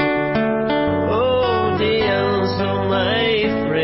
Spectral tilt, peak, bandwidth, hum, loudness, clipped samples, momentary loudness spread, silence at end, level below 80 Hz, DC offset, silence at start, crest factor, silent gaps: -9.5 dB/octave; -8 dBFS; 5.8 kHz; none; -18 LUFS; under 0.1%; 2 LU; 0 s; -42 dBFS; under 0.1%; 0 s; 10 dB; none